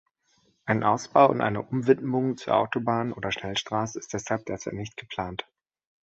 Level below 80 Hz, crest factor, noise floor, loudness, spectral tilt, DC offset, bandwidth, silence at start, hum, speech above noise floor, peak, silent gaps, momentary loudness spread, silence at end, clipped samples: -58 dBFS; 22 dB; -68 dBFS; -26 LUFS; -5.5 dB/octave; under 0.1%; 8 kHz; 0.65 s; none; 42 dB; -4 dBFS; none; 14 LU; 0.6 s; under 0.1%